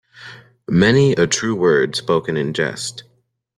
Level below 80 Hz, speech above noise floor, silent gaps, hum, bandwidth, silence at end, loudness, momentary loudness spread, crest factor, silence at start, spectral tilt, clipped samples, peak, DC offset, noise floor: -52 dBFS; 24 dB; none; none; 12.5 kHz; 0.55 s; -17 LUFS; 24 LU; 16 dB; 0.2 s; -5 dB/octave; under 0.1%; -2 dBFS; under 0.1%; -40 dBFS